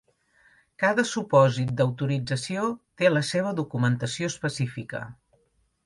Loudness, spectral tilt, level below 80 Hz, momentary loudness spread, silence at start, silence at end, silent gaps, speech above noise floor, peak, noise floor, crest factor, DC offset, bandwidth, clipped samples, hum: -25 LUFS; -5.5 dB/octave; -62 dBFS; 10 LU; 0.8 s; 0.7 s; none; 44 dB; -6 dBFS; -69 dBFS; 20 dB; under 0.1%; 11.5 kHz; under 0.1%; none